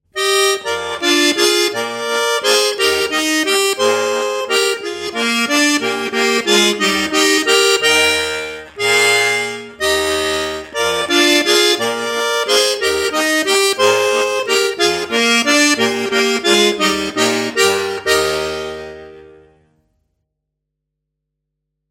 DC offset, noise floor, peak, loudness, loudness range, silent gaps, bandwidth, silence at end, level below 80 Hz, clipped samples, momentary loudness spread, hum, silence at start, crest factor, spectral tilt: under 0.1%; -77 dBFS; 0 dBFS; -14 LUFS; 4 LU; none; 16.5 kHz; 2.65 s; -50 dBFS; under 0.1%; 8 LU; none; 0.15 s; 16 dB; -1.5 dB/octave